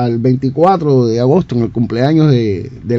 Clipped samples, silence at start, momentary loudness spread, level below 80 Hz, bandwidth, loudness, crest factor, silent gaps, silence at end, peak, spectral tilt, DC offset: 0.2%; 0 s; 6 LU; -44 dBFS; 6.8 kHz; -13 LUFS; 12 dB; none; 0 s; 0 dBFS; -9 dB/octave; under 0.1%